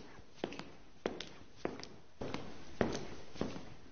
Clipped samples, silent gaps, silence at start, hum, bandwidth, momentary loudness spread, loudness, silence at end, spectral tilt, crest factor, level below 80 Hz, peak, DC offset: under 0.1%; none; 0 s; none; 7 kHz; 13 LU; -44 LUFS; 0 s; -4.5 dB/octave; 30 dB; -62 dBFS; -14 dBFS; under 0.1%